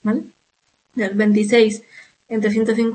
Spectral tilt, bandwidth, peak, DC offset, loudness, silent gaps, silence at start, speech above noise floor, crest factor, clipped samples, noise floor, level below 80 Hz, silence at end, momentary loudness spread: -6 dB/octave; 8.8 kHz; -4 dBFS; under 0.1%; -18 LUFS; none; 0.05 s; 49 dB; 16 dB; under 0.1%; -66 dBFS; -66 dBFS; 0 s; 13 LU